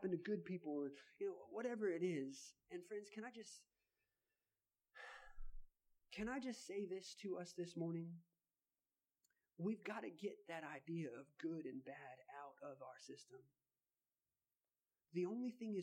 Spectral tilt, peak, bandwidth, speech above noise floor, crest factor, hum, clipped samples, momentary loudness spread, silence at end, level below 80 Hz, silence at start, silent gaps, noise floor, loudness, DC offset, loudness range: -6 dB/octave; -32 dBFS; 16 kHz; over 42 dB; 18 dB; none; under 0.1%; 15 LU; 0 s; -68 dBFS; 0 s; none; under -90 dBFS; -49 LUFS; under 0.1%; 10 LU